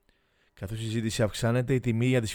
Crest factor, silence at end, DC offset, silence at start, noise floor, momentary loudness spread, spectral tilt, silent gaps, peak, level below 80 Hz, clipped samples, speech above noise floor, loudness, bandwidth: 16 dB; 0 s; under 0.1%; 0.6 s; -68 dBFS; 11 LU; -6 dB/octave; none; -12 dBFS; -52 dBFS; under 0.1%; 41 dB; -28 LUFS; 18.5 kHz